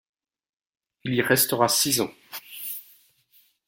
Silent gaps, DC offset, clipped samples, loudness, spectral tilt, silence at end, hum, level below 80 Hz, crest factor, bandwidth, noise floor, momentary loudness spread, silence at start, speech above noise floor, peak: none; under 0.1%; under 0.1%; -23 LUFS; -2.5 dB/octave; 0.85 s; none; -66 dBFS; 24 dB; 17 kHz; -62 dBFS; 17 LU; 1.05 s; 39 dB; -4 dBFS